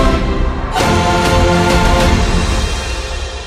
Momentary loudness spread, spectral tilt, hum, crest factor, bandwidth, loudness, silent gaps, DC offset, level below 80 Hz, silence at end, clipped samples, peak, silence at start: 8 LU; -5 dB/octave; none; 12 dB; 15.5 kHz; -14 LUFS; none; under 0.1%; -18 dBFS; 0 s; under 0.1%; 0 dBFS; 0 s